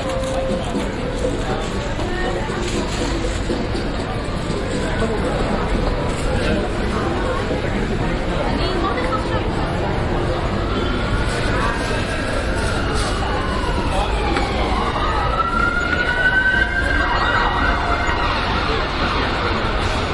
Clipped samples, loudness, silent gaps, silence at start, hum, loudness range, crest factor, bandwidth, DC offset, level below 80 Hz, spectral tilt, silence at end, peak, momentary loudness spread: under 0.1%; -20 LUFS; none; 0 s; none; 5 LU; 14 dB; 11.5 kHz; under 0.1%; -26 dBFS; -5.5 dB/octave; 0 s; -4 dBFS; 5 LU